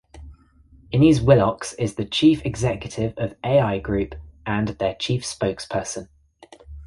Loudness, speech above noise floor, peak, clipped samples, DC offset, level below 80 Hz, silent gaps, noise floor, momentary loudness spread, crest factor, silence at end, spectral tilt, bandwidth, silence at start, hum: -22 LUFS; 32 dB; -2 dBFS; under 0.1%; under 0.1%; -42 dBFS; none; -53 dBFS; 11 LU; 20 dB; 0 s; -6 dB/octave; 11.5 kHz; 0.15 s; none